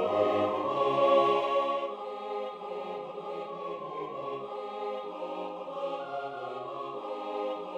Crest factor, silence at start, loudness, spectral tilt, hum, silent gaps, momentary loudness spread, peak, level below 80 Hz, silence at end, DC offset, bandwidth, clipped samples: 20 dB; 0 s; -32 LUFS; -6 dB/octave; none; none; 13 LU; -12 dBFS; -80 dBFS; 0 s; under 0.1%; 8.6 kHz; under 0.1%